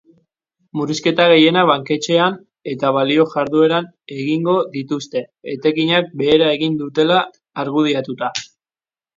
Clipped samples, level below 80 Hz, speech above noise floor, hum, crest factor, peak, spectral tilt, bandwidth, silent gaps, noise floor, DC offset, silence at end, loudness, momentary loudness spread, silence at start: under 0.1%; -62 dBFS; over 74 dB; none; 18 dB; 0 dBFS; -5 dB/octave; 7.6 kHz; none; under -90 dBFS; under 0.1%; 0.7 s; -17 LUFS; 13 LU; 0.75 s